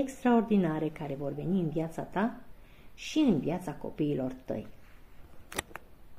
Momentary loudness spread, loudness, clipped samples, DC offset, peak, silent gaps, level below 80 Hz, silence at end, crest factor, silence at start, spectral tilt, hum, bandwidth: 13 LU; -32 LUFS; under 0.1%; under 0.1%; -10 dBFS; none; -54 dBFS; 0 s; 22 dB; 0 s; -6.5 dB/octave; none; 15.5 kHz